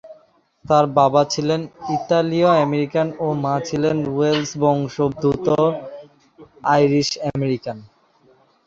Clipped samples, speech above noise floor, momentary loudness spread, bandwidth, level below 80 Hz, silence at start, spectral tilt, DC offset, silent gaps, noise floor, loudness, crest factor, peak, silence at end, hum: under 0.1%; 37 dB; 10 LU; 7.8 kHz; -54 dBFS; 0.05 s; -6 dB/octave; under 0.1%; none; -56 dBFS; -19 LUFS; 18 dB; -2 dBFS; 0.8 s; none